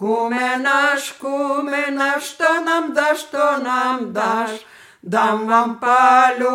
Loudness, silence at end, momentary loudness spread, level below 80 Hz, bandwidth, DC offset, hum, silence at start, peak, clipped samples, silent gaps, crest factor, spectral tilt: -17 LUFS; 0 s; 9 LU; -72 dBFS; 17 kHz; under 0.1%; none; 0 s; -2 dBFS; under 0.1%; none; 16 dB; -3.5 dB/octave